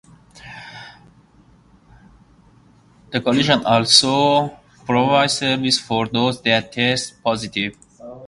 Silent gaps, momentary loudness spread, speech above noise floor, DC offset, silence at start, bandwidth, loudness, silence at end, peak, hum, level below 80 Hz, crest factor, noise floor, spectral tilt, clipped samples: none; 23 LU; 34 dB; under 0.1%; 0.45 s; 11.5 kHz; -17 LUFS; 0 s; 0 dBFS; none; -54 dBFS; 20 dB; -52 dBFS; -3.5 dB/octave; under 0.1%